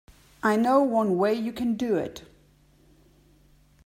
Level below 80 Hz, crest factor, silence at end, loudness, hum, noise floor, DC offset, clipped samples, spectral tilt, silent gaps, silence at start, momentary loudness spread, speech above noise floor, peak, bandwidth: -60 dBFS; 18 dB; 1.65 s; -25 LUFS; none; -59 dBFS; under 0.1%; under 0.1%; -6.5 dB/octave; none; 0.45 s; 8 LU; 35 dB; -8 dBFS; 16 kHz